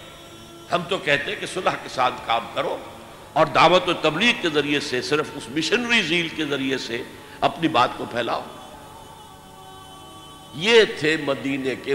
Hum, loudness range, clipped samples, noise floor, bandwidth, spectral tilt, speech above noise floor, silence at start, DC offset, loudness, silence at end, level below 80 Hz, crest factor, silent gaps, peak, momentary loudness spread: none; 6 LU; under 0.1%; -43 dBFS; 16 kHz; -4 dB/octave; 22 dB; 0 s; under 0.1%; -21 LUFS; 0 s; -56 dBFS; 20 dB; none; -4 dBFS; 25 LU